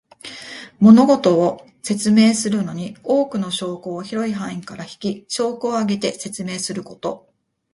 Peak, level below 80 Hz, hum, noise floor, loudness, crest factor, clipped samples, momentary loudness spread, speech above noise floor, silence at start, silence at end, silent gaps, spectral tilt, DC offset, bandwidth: 0 dBFS; -62 dBFS; none; -37 dBFS; -19 LUFS; 18 dB; under 0.1%; 18 LU; 19 dB; 0.25 s; 0.55 s; none; -5.5 dB/octave; under 0.1%; 11.5 kHz